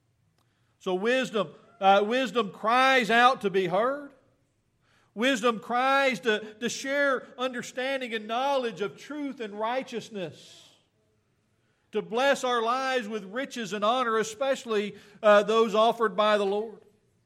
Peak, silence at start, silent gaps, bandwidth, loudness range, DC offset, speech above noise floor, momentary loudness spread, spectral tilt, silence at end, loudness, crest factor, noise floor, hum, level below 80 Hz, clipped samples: -6 dBFS; 0.85 s; none; 15 kHz; 8 LU; under 0.1%; 44 dB; 14 LU; -3.5 dB/octave; 0.5 s; -26 LUFS; 20 dB; -71 dBFS; none; -80 dBFS; under 0.1%